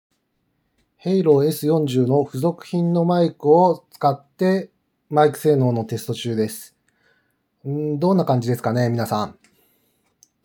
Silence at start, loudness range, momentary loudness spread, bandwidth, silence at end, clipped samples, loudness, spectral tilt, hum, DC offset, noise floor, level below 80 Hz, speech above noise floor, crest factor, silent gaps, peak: 1.05 s; 5 LU; 10 LU; over 20 kHz; 1.15 s; under 0.1%; -20 LUFS; -7.5 dB/octave; none; under 0.1%; -70 dBFS; -72 dBFS; 51 dB; 18 dB; none; -2 dBFS